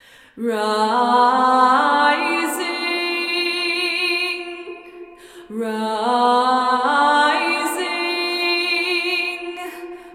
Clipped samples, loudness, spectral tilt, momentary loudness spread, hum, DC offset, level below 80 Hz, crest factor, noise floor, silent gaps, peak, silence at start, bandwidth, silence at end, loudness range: under 0.1%; -18 LUFS; -2 dB/octave; 13 LU; none; under 0.1%; -66 dBFS; 18 dB; -40 dBFS; none; -2 dBFS; 0.35 s; 16.5 kHz; 0 s; 5 LU